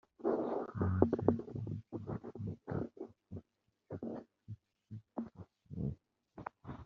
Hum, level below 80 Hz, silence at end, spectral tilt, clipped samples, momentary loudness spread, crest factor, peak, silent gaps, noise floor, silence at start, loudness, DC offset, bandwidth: none; -64 dBFS; 0 s; -10.5 dB/octave; under 0.1%; 21 LU; 28 dB; -12 dBFS; none; -76 dBFS; 0.2 s; -40 LUFS; under 0.1%; 5 kHz